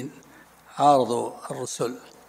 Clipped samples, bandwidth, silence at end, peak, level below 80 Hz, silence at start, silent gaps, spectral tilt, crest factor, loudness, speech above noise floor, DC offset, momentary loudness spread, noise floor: under 0.1%; 16 kHz; 0.2 s; -6 dBFS; -72 dBFS; 0 s; none; -5 dB/octave; 20 dB; -24 LUFS; 28 dB; under 0.1%; 17 LU; -52 dBFS